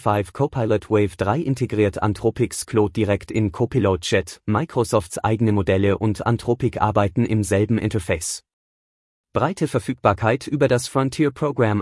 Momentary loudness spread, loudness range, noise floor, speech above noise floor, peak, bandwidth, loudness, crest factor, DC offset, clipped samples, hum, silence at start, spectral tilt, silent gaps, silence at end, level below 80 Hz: 4 LU; 2 LU; under -90 dBFS; over 70 dB; -2 dBFS; 12 kHz; -21 LUFS; 18 dB; under 0.1%; under 0.1%; none; 0 s; -6 dB/octave; 8.53-9.24 s; 0 s; -48 dBFS